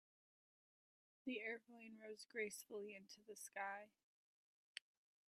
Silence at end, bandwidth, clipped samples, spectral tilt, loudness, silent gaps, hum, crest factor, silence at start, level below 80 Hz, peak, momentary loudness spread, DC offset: 0.5 s; 14.5 kHz; under 0.1%; -2.5 dB/octave; -52 LUFS; 4.03-4.75 s; none; 24 dB; 1.25 s; under -90 dBFS; -32 dBFS; 11 LU; under 0.1%